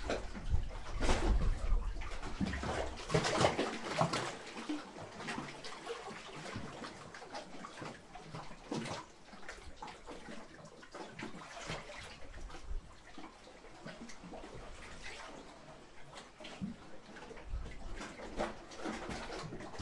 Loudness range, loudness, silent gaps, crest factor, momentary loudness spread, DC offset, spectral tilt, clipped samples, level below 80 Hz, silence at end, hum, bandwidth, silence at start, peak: 14 LU; -42 LUFS; none; 24 dB; 17 LU; under 0.1%; -4.5 dB/octave; under 0.1%; -44 dBFS; 0 s; none; 11.5 kHz; 0 s; -16 dBFS